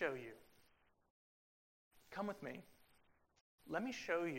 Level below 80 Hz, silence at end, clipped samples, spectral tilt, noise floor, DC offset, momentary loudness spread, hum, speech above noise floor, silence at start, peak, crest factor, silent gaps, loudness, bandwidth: -80 dBFS; 0 s; under 0.1%; -5 dB/octave; -75 dBFS; under 0.1%; 15 LU; none; 31 dB; 0 s; -26 dBFS; 22 dB; 1.10-1.91 s, 3.41-3.58 s; -46 LUFS; 16 kHz